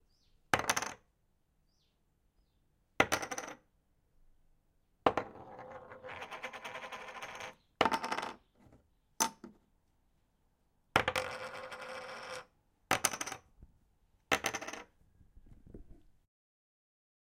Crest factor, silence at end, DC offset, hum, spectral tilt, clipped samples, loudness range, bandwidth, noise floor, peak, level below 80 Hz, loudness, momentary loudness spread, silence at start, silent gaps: 32 dB; 1.25 s; under 0.1%; none; -2 dB/octave; under 0.1%; 4 LU; 16.5 kHz; -75 dBFS; -8 dBFS; -66 dBFS; -36 LUFS; 19 LU; 0.55 s; none